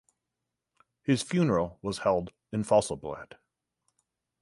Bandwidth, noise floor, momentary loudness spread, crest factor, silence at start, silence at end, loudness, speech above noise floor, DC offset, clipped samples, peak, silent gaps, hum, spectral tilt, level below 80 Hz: 11.5 kHz; -86 dBFS; 12 LU; 20 dB; 1.1 s; 1.2 s; -29 LUFS; 58 dB; under 0.1%; under 0.1%; -10 dBFS; none; none; -6 dB/octave; -58 dBFS